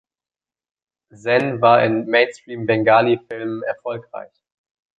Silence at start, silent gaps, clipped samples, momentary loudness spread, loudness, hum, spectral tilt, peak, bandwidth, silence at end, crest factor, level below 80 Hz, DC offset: 1.25 s; none; under 0.1%; 15 LU; -18 LUFS; none; -6.5 dB/octave; -2 dBFS; 8 kHz; 0.75 s; 18 dB; -62 dBFS; under 0.1%